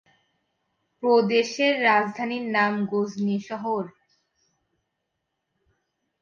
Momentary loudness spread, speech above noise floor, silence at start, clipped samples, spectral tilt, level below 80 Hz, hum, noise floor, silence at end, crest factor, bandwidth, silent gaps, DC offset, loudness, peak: 9 LU; 57 dB; 1 s; under 0.1%; -5 dB/octave; -76 dBFS; none; -80 dBFS; 2.3 s; 20 dB; 7.2 kHz; none; under 0.1%; -23 LUFS; -8 dBFS